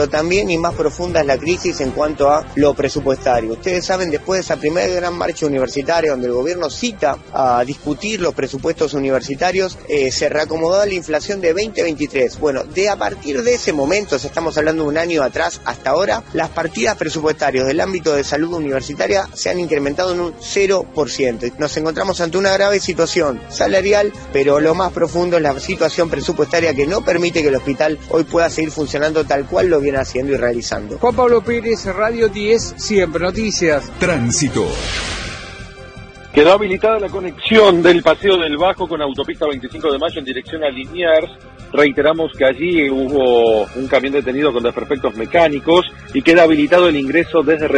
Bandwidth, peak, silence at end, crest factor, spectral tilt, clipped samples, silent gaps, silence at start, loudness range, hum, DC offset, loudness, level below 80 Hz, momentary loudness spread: 9.6 kHz; 0 dBFS; 0 s; 16 dB; -4.5 dB/octave; under 0.1%; none; 0 s; 4 LU; none; under 0.1%; -16 LUFS; -38 dBFS; 8 LU